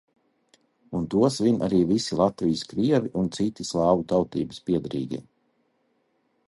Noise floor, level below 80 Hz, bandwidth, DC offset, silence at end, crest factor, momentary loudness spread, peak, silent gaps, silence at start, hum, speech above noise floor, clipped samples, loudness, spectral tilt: -70 dBFS; -54 dBFS; 11.5 kHz; under 0.1%; 1.25 s; 18 dB; 10 LU; -6 dBFS; none; 0.9 s; none; 46 dB; under 0.1%; -25 LUFS; -6.5 dB/octave